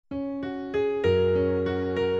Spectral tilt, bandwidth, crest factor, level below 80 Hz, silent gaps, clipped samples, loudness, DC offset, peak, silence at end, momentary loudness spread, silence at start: -8 dB/octave; 7.2 kHz; 14 dB; -52 dBFS; none; under 0.1%; -26 LUFS; under 0.1%; -12 dBFS; 0 s; 9 LU; 0.1 s